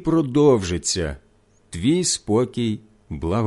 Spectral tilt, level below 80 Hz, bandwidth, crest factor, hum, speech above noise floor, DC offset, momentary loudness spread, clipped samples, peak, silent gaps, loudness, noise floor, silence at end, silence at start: -5 dB/octave; -40 dBFS; 11.5 kHz; 16 dB; none; 37 dB; under 0.1%; 17 LU; under 0.1%; -4 dBFS; none; -21 LUFS; -57 dBFS; 0 s; 0 s